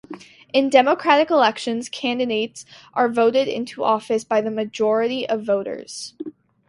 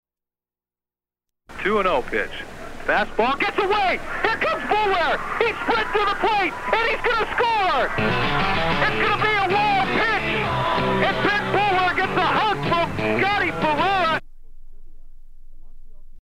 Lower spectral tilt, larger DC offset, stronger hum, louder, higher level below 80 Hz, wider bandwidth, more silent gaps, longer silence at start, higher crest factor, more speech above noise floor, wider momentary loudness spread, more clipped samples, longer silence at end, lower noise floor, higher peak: about the same, -4 dB/octave vs -5 dB/octave; neither; neither; about the same, -20 LUFS vs -21 LUFS; second, -68 dBFS vs -38 dBFS; second, 11.5 kHz vs 15 kHz; neither; second, 0.1 s vs 1.5 s; about the same, 20 dB vs 16 dB; second, 20 dB vs over 69 dB; first, 17 LU vs 4 LU; neither; first, 0.4 s vs 0 s; second, -40 dBFS vs under -90 dBFS; first, 0 dBFS vs -6 dBFS